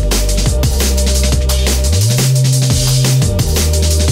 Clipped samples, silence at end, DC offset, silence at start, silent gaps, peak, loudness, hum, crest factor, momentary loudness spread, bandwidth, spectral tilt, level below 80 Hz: under 0.1%; 0 s; under 0.1%; 0 s; none; -2 dBFS; -13 LUFS; none; 10 dB; 3 LU; 16.5 kHz; -4.5 dB/octave; -16 dBFS